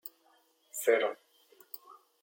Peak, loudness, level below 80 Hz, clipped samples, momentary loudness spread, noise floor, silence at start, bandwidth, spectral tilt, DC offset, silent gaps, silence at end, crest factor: -14 dBFS; -31 LUFS; under -90 dBFS; under 0.1%; 20 LU; -68 dBFS; 0.05 s; 17 kHz; -1 dB/octave; under 0.1%; none; 0.3 s; 22 dB